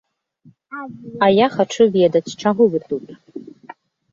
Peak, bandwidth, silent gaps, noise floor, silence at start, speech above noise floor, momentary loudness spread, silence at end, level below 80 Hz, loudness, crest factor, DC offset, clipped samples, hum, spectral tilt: -2 dBFS; 7.6 kHz; none; -53 dBFS; 0.7 s; 35 dB; 22 LU; 0.75 s; -60 dBFS; -17 LUFS; 18 dB; under 0.1%; under 0.1%; none; -6 dB/octave